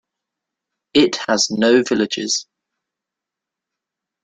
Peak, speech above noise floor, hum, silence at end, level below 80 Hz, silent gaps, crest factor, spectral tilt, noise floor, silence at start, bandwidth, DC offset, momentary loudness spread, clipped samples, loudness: -2 dBFS; 68 dB; none; 1.8 s; -60 dBFS; none; 18 dB; -3 dB/octave; -85 dBFS; 0.95 s; 9.4 kHz; under 0.1%; 6 LU; under 0.1%; -17 LUFS